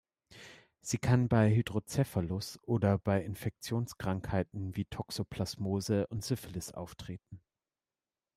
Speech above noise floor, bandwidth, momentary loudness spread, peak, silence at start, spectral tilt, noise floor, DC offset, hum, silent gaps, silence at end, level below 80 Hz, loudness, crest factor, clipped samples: over 57 dB; 15.5 kHz; 18 LU; -14 dBFS; 0.3 s; -6.5 dB/octave; under -90 dBFS; under 0.1%; none; none; 1 s; -58 dBFS; -33 LUFS; 20 dB; under 0.1%